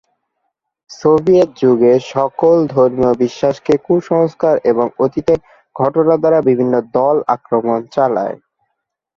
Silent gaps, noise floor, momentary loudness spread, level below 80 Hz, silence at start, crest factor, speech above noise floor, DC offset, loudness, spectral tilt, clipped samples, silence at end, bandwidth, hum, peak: none; -73 dBFS; 6 LU; -52 dBFS; 0.9 s; 14 dB; 60 dB; under 0.1%; -14 LUFS; -8 dB/octave; under 0.1%; 0.8 s; 7.2 kHz; none; 0 dBFS